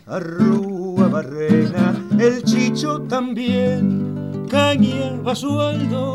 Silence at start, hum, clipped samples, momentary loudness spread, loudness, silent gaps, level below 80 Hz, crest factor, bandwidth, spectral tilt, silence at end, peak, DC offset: 0.05 s; none; under 0.1%; 7 LU; -19 LUFS; none; -60 dBFS; 14 dB; 12 kHz; -6.5 dB/octave; 0 s; -4 dBFS; 0.1%